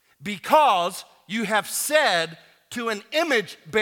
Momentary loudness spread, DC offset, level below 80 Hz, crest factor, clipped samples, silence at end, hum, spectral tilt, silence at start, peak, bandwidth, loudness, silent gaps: 13 LU; under 0.1%; -70 dBFS; 18 dB; under 0.1%; 0 s; none; -2.5 dB/octave; 0.2 s; -4 dBFS; 18 kHz; -22 LUFS; none